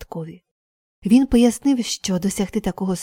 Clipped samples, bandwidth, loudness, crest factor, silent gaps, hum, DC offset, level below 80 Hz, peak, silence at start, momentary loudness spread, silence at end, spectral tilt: under 0.1%; 16.5 kHz; -19 LUFS; 16 dB; 0.51-1.02 s; none; under 0.1%; -42 dBFS; -4 dBFS; 0 s; 17 LU; 0 s; -5 dB/octave